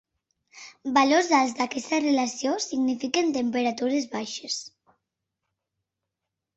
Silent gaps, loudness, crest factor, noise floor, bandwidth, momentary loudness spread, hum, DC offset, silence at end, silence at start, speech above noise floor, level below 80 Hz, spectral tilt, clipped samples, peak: none; -25 LUFS; 20 dB; -85 dBFS; 8.2 kHz; 12 LU; none; under 0.1%; 1.9 s; 0.55 s; 61 dB; -70 dBFS; -2.5 dB/octave; under 0.1%; -8 dBFS